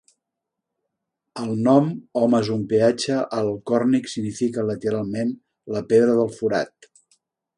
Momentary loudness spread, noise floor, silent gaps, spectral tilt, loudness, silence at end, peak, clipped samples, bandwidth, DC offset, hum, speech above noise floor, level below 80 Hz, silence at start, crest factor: 12 LU; -83 dBFS; none; -6.5 dB/octave; -22 LUFS; 0.9 s; -4 dBFS; under 0.1%; 11 kHz; under 0.1%; none; 62 dB; -62 dBFS; 1.35 s; 20 dB